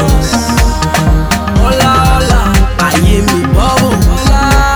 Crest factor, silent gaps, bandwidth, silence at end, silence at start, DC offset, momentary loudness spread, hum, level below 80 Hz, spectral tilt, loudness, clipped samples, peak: 8 dB; none; over 20 kHz; 0 s; 0 s; under 0.1%; 3 LU; none; -12 dBFS; -5 dB/octave; -10 LUFS; under 0.1%; 0 dBFS